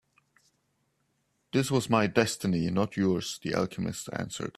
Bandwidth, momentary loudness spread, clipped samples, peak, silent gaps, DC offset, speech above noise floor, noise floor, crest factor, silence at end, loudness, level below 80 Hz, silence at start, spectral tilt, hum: 14.5 kHz; 9 LU; under 0.1%; -8 dBFS; none; under 0.1%; 46 dB; -75 dBFS; 22 dB; 0.1 s; -29 LUFS; -62 dBFS; 1.55 s; -5 dB/octave; none